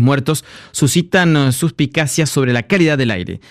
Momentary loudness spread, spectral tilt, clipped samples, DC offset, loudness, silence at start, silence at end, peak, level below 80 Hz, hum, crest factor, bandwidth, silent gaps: 7 LU; -5 dB/octave; under 0.1%; under 0.1%; -15 LUFS; 0 s; 0.15 s; -2 dBFS; -48 dBFS; none; 12 dB; 15 kHz; none